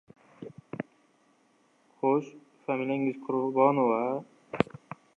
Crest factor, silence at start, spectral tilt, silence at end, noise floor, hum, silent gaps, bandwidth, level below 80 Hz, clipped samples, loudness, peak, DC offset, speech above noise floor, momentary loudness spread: 26 dB; 0.4 s; -8.5 dB/octave; 0.55 s; -67 dBFS; none; none; 7.8 kHz; -68 dBFS; under 0.1%; -29 LUFS; -4 dBFS; under 0.1%; 39 dB; 22 LU